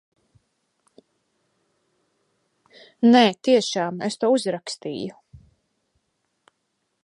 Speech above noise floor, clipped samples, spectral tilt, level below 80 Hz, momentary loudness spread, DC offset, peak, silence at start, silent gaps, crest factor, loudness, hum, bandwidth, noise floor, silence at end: 55 dB; under 0.1%; -4.5 dB/octave; -68 dBFS; 16 LU; under 0.1%; -4 dBFS; 3 s; none; 20 dB; -21 LUFS; none; 11 kHz; -75 dBFS; 1.65 s